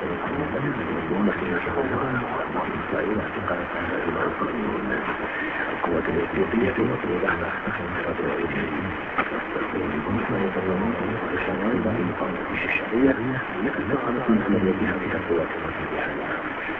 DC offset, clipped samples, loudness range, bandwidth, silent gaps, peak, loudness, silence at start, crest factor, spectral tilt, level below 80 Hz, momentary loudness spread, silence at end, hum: under 0.1%; under 0.1%; 3 LU; 5.6 kHz; none; -6 dBFS; -25 LUFS; 0 s; 18 dB; -9 dB/octave; -46 dBFS; 5 LU; 0 s; none